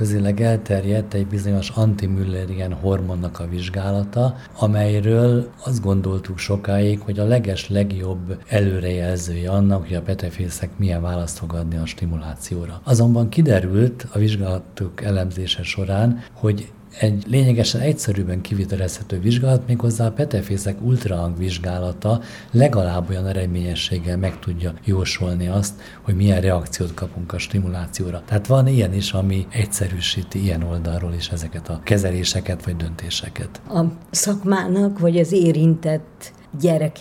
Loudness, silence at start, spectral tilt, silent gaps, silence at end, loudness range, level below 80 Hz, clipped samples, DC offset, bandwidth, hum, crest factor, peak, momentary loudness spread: -21 LUFS; 0 s; -6 dB/octave; none; 0 s; 3 LU; -40 dBFS; under 0.1%; under 0.1%; 15.5 kHz; none; 20 dB; 0 dBFS; 10 LU